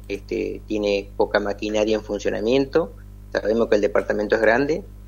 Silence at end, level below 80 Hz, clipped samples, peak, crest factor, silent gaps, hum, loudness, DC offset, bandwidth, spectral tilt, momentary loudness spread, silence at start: 0 s; -40 dBFS; under 0.1%; -4 dBFS; 18 dB; none; none; -22 LUFS; under 0.1%; 16 kHz; -5.5 dB/octave; 8 LU; 0 s